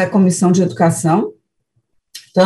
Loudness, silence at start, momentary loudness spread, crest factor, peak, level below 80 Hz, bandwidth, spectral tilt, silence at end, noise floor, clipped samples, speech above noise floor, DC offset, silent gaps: -14 LUFS; 0 s; 11 LU; 14 dB; -2 dBFS; -60 dBFS; 12.5 kHz; -6 dB/octave; 0 s; -67 dBFS; under 0.1%; 53 dB; under 0.1%; none